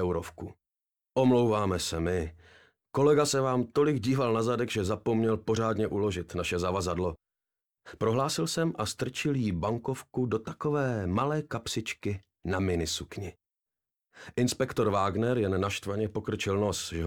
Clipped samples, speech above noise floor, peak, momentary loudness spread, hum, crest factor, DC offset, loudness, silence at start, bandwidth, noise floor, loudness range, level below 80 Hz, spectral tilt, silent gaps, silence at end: under 0.1%; 61 dB; -14 dBFS; 9 LU; none; 16 dB; under 0.1%; -29 LUFS; 0 s; 17.5 kHz; -90 dBFS; 4 LU; -56 dBFS; -5.5 dB/octave; none; 0 s